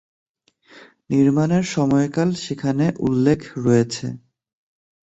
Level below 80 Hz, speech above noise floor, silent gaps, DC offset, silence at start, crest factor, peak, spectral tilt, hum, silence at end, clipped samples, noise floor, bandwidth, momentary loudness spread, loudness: -54 dBFS; 35 dB; none; under 0.1%; 0.75 s; 16 dB; -4 dBFS; -7 dB/octave; none; 0.9 s; under 0.1%; -54 dBFS; 8.2 kHz; 8 LU; -20 LUFS